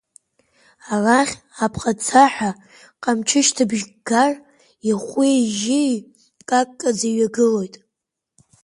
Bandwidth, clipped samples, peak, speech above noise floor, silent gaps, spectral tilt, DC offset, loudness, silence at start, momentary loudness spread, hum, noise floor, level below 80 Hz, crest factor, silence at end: 11.5 kHz; under 0.1%; 0 dBFS; 64 dB; none; -3.5 dB/octave; under 0.1%; -19 LUFS; 0.85 s; 10 LU; none; -82 dBFS; -58 dBFS; 20 dB; 0.95 s